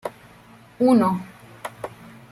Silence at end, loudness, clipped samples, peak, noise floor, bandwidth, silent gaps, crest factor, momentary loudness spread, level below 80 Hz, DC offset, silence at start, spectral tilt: 0.45 s; -20 LUFS; under 0.1%; -8 dBFS; -49 dBFS; 13.5 kHz; none; 18 dB; 20 LU; -62 dBFS; under 0.1%; 0.05 s; -7.5 dB/octave